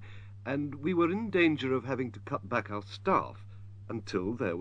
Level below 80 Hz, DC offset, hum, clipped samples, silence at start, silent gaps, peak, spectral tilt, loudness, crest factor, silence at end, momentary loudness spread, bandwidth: -64 dBFS; under 0.1%; none; under 0.1%; 0 s; none; -16 dBFS; -7 dB/octave; -32 LUFS; 16 dB; 0 s; 16 LU; 8.2 kHz